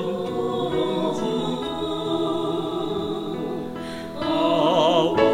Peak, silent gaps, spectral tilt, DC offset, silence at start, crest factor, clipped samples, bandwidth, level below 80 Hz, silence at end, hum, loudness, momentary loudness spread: -6 dBFS; none; -6 dB/octave; under 0.1%; 0 s; 18 dB; under 0.1%; 16 kHz; -54 dBFS; 0 s; none; -24 LUFS; 10 LU